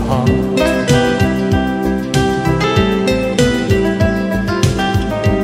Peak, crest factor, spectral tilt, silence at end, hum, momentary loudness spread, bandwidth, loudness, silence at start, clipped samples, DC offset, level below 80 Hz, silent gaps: 0 dBFS; 14 dB; -6 dB/octave; 0 s; none; 3 LU; 16 kHz; -14 LUFS; 0 s; under 0.1%; under 0.1%; -28 dBFS; none